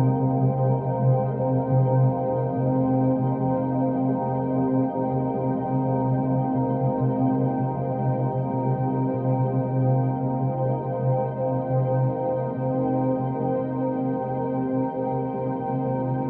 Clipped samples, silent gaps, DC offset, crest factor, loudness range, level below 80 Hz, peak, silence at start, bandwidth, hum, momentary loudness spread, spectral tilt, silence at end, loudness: under 0.1%; none; under 0.1%; 14 dB; 2 LU; -58 dBFS; -10 dBFS; 0 s; 2.5 kHz; none; 4 LU; -12 dB/octave; 0 s; -24 LUFS